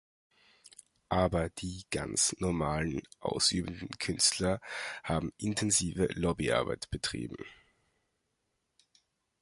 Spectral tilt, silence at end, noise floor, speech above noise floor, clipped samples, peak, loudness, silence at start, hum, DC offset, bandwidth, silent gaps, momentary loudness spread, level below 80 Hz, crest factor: -3.5 dB/octave; 1.85 s; -81 dBFS; 49 dB; under 0.1%; -14 dBFS; -32 LUFS; 0.65 s; none; under 0.1%; 11.5 kHz; none; 11 LU; -50 dBFS; 20 dB